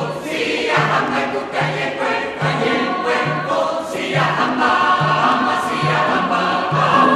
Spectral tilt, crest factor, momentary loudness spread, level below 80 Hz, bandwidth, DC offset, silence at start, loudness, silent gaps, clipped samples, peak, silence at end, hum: -5 dB/octave; 16 dB; 5 LU; -56 dBFS; 13.5 kHz; under 0.1%; 0 s; -17 LUFS; none; under 0.1%; -2 dBFS; 0 s; none